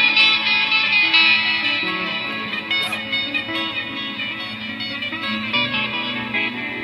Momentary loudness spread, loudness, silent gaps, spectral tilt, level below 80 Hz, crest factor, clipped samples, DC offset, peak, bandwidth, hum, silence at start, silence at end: 12 LU; -18 LUFS; none; -3 dB/octave; -58 dBFS; 18 dB; under 0.1%; under 0.1%; -2 dBFS; 15 kHz; none; 0 s; 0 s